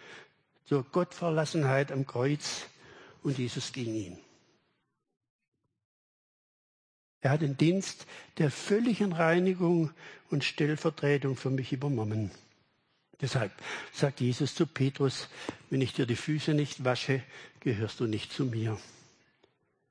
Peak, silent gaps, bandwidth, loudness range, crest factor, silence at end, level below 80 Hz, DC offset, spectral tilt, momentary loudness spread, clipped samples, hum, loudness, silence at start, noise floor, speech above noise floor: -12 dBFS; 5.30-5.39 s, 5.48-5.52 s, 5.85-7.21 s; 10.5 kHz; 9 LU; 20 dB; 1 s; -72 dBFS; under 0.1%; -6 dB/octave; 11 LU; under 0.1%; none; -31 LUFS; 0 s; -79 dBFS; 48 dB